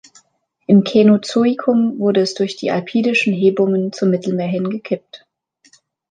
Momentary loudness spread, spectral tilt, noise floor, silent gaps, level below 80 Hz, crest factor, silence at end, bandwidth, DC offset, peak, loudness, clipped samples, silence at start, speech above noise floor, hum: 9 LU; -6.5 dB/octave; -57 dBFS; none; -64 dBFS; 14 dB; 0.95 s; 9.4 kHz; under 0.1%; -2 dBFS; -16 LUFS; under 0.1%; 0.7 s; 42 dB; none